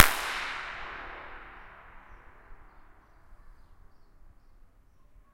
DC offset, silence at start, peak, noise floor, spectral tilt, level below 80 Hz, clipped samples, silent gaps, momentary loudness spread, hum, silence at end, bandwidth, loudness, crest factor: under 0.1%; 0 s; 0 dBFS; -57 dBFS; -0.5 dB/octave; -52 dBFS; under 0.1%; none; 24 LU; none; 1.85 s; 16.5 kHz; -31 LUFS; 32 dB